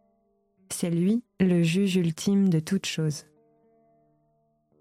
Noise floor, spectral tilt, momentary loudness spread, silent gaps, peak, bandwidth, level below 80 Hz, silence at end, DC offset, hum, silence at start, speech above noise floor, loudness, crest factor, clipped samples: -70 dBFS; -6 dB/octave; 8 LU; none; -12 dBFS; 15 kHz; -66 dBFS; 1.6 s; under 0.1%; none; 0.7 s; 45 dB; -25 LUFS; 14 dB; under 0.1%